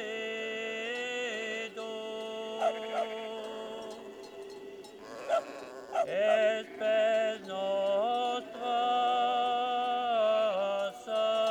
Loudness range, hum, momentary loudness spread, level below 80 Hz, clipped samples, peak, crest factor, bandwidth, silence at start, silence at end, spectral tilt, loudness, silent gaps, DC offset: 8 LU; none; 16 LU; -78 dBFS; under 0.1%; -16 dBFS; 16 dB; 12 kHz; 0 s; 0 s; -3 dB/octave; -31 LUFS; none; under 0.1%